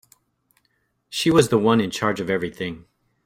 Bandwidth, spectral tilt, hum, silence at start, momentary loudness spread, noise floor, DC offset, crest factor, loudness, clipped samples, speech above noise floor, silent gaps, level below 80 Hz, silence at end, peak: 16 kHz; -5 dB/octave; none; 1.1 s; 14 LU; -70 dBFS; under 0.1%; 20 dB; -21 LUFS; under 0.1%; 49 dB; none; -56 dBFS; 0.45 s; -2 dBFS